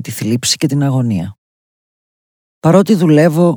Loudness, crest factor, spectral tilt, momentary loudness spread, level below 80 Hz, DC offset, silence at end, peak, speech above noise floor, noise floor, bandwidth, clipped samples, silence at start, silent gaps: -13 LUFS; 14 dB; -5.5 dB/octave; 9 LU; -54 dBFS; under 0.1%; 0 s; 0 dBFS; over 78 dB; under -90 dBFS; over 20 kHz; under 0.1%; 0 s; 1.38-2.62 s